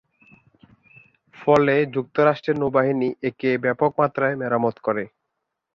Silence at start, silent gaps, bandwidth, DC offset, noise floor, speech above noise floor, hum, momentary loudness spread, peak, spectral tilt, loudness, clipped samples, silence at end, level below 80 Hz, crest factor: 1.4 s; none; 7.2 kHz; under 0.1%; -79 dBFS; 58 dB; none; 8 LU; -2 dBFS; -8 dB/octave; -21 LUFS; under 0.1%; 0.65 s; -62 dBFS; 20 dB